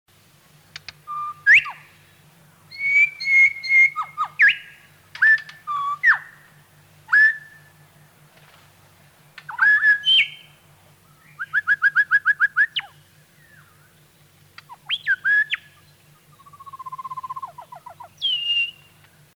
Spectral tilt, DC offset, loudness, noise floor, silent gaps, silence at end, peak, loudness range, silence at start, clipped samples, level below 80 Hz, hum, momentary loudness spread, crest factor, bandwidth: 0.5 dB/octave; under 0.1%; -17 LUFS; -54 dBFS; none; 0.7 s; -6 dBFS; 8 LU; 1.1 s; under 0.1%; -70 dBFS; none; 20 LU; 16 dB; 19 kHz